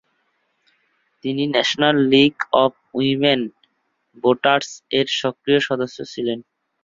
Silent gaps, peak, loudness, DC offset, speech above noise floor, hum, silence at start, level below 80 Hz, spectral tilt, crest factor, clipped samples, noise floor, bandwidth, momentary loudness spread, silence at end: none; -2 dBFS; -19 LUFS; under 0.1%; 50 dB; none; 1.25 s; -62 dBFS; -5 dB/octave; 18 dB; under 0.1%; -69 dBFS; 7.6 kHz; 11 LU; 0.4 s